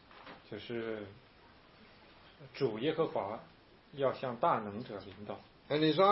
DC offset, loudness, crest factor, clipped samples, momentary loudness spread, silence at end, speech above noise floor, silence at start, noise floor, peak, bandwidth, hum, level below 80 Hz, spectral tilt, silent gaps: under 0.1%; -36 LUFS; 22 dB; under 0.1%; 19 LU; 0 s; 26 dB; 0.1 s; -61 dBFS; -14 dBFS; 5.8 kHz; none; -72 dBFS; -4 dB/octave; none